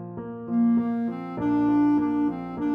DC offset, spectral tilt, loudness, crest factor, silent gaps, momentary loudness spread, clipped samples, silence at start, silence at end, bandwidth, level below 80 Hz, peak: under 0.1%; -10 dB/octave; -24 LUFS; 10 dB; none; 9 LU; under 0.1%; 0 s; 0 s; 4 kHz; -56 dBFS; -16 dBFS